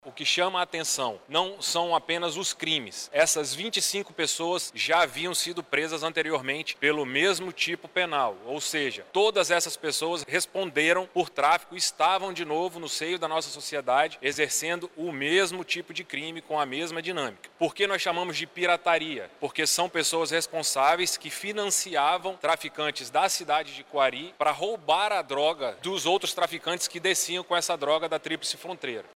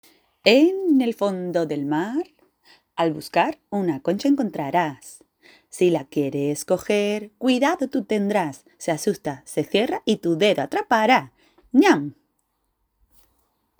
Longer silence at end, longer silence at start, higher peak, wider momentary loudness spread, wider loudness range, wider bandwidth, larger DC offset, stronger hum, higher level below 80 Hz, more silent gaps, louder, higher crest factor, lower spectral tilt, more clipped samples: second, 0.15 s vs 1.7 s; second, 0.05 s vs 0.45 s; second, -8 dBFS vs 0 dBFS; second, 7 LU vs 11 LU; about the same, 2 LU vs 4 LU; second, 16 kHz vs over 20 kHz; neither; neither; second, -76 dBFS vs -66 dBFS; neither; second, -27 LUFS vs -22 LUFS; about the same, 18 dB vs 22 dB; second, -1.5 dB/octave vs -5 dB/octave; neither